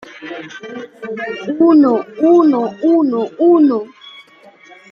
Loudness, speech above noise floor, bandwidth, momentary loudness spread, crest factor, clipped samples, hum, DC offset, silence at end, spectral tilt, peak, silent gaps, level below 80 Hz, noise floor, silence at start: -13 LUFS; 31 dB; 6.6 kHz; 19 LU; 12 dB; under 0.1%; none; under 0.1%; 0.7 s; -7 dB/octave; -2 dBFS; none; -66 dBFS; -44 dBFS; 0.05 s